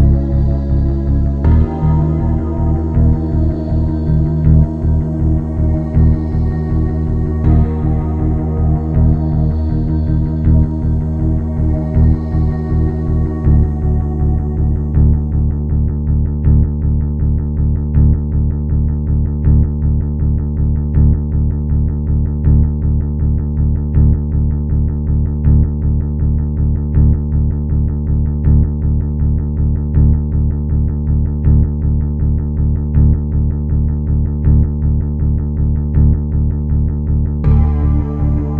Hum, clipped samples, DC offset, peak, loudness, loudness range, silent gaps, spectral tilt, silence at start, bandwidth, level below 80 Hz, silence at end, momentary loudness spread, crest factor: none; under 0.1%; under 0.1%; 0 dBFS; -15 LUFS; 1 LU; none; -12.5 dB/octave; 0 s; 2.2 kHz; -16 dBFS; 0 s; 4 LU; 12 dB